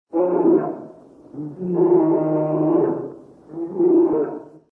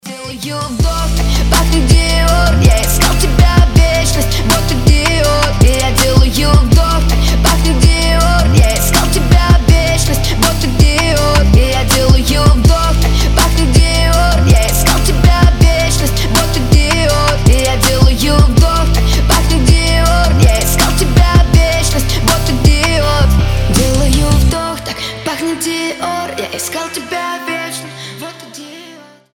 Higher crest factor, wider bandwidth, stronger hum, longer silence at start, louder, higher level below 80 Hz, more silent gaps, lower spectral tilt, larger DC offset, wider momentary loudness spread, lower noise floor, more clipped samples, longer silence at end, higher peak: about the same, 14 dB vs 10 dB; second, 2.8 kHz vs 18 kHz; neither; about the same, 0.15 s vs 0.05 s; second, -19 LUFS vs -11 LUFS; second, -66 dBFS vs -12 dBFS; neither; first, -12.5 dB/octave vs -4.5 dB/octave; neither; first, 19 LU vs 10 LU; first, -43 dBFS vs -37 dBFS; neither; second, 0.25 s vs 0.4 s; second, -6 dBFS vs 0 dBFS